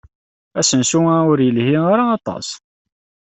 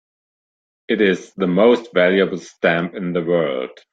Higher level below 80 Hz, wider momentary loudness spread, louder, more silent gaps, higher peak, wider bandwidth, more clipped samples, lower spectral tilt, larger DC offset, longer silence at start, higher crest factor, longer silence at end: first, -56 dBFS vs -62 dBFS; first, 14 LU vs 8 LU; first, -15 LUFS vs -18 LUFS; neither; about the same, -2 dBFS vs -2 dBFS; about the same, 8.4 kHz vs 7.8 kHz; neither; second, -4.5 dB/octave vs -6.5 dB/octave; neither; second, 0.55 s vs 0.9 s; about the same, 14 dB vs 16 dB; first, 0.75 s vs 0.2 s